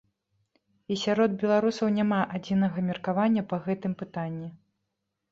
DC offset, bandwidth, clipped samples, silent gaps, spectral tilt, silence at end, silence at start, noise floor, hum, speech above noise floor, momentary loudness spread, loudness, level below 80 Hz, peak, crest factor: under 0.1%; 7.6 kHz; under 0.1%; none; -7 dB/octave; 0.75 s; 0.9 s; -82 dBFS; none; 55 dB; 10 LU; -27 LUFS; -66 dBFS; -12 dBFS; 16 dB